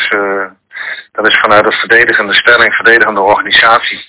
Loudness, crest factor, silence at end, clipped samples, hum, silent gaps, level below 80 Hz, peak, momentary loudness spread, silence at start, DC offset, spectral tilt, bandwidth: -7 LUFS; 10 dB; 0.05 s; 4%; none; none; -48 dBFS; 0 dBFS; 14 LU; 0 s; under 0.1%; -6 dB/octave; 4 kHz